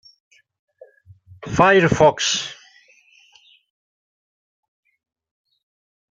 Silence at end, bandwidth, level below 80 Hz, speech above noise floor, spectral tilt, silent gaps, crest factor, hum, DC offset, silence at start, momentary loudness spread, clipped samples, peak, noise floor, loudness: 3.6 s; 9.2 kHz; -52 dBFS; 38 dB; -4 dB/octave; none; 22 dB; none; under 0.1%; 1.4 s; 17 LU; under 0.1%; -2 dBFS; -54 dBFS; -16 LUFS